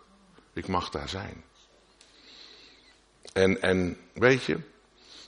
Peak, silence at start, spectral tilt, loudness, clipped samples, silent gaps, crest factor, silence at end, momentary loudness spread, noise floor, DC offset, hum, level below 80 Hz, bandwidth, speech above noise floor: -6 dBFS; 0.55 s; -5.5 dB/octave; -28 LUFS; under 0.1%; none; 24 dB; 0 s; 25 LU; -60 dBFS; under 0.1%; none; -56 dBFS; 10.5 kHz; 33 dB